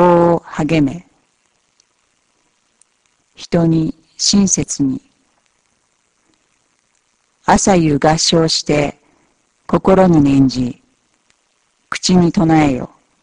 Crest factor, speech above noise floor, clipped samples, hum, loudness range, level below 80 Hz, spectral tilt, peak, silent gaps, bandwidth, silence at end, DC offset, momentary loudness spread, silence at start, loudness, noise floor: 16 dB; 49 dB; under 0.1%; none; 8 LU; -40 dBFS; -5 dB/octave; 0 dBFS; none; 10.5 kHz; 0.35 s; under 0.1%; 12 LU; 0 s; -14 LUFS; -62 dBFS